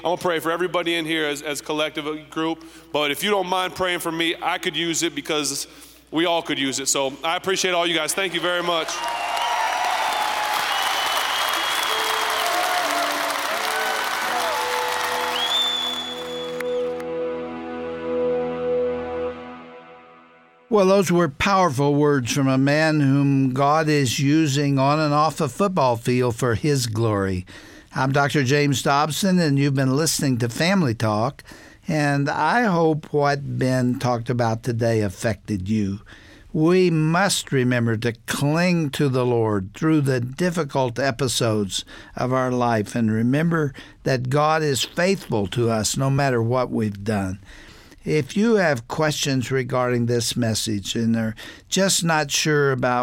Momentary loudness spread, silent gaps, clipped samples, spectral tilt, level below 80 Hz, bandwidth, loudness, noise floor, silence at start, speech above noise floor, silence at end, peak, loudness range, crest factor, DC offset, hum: 8 LU; none; under 0.1%; -4.5 dB/octave; -52 dBFS; 17 kHz; -21 LUFS; -52 dBFS; 0 s; 31 dB; 0 s; -6 dBFS; 4 LU; 16 dB; under 0.1%; none